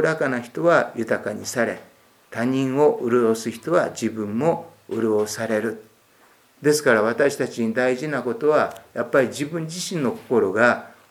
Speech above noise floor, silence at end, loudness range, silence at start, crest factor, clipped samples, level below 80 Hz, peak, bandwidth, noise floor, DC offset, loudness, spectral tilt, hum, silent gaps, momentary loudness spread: 34 dB; 0.2 s; 2 LU; 0 s; 20 dB; under 0.1%; -72 dBFS; -2 dBFS; 17 kHz; -56 dBFS; under 0.1%; -22 LUFS; -5 dB/octave; none; none; 9 LU